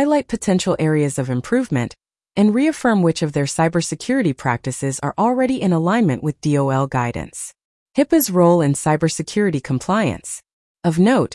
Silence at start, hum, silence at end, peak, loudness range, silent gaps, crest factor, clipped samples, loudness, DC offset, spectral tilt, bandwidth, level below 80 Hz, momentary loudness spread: 0 s; none; 0 s; -4 dBFS; 1 LU; 7.64-7.86 s, 10.53-10.75 s; 14 dB; under 0.1%; -18 LUFS; under 0.1%; -6 dB/octave; 12 kHz; -50 dBFS; 9 LU